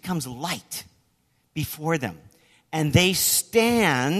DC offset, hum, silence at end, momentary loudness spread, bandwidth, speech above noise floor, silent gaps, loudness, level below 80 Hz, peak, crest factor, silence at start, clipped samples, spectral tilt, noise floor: under 0.1%; none; 0 s; 15 LU; 14 kHz; 44 dB; none; -23 LUFS; -52 dBFS; -4 dBFS; 22 dB; 0.05 s; under 0.1%; -3.5 dB/octave; -67 dBFS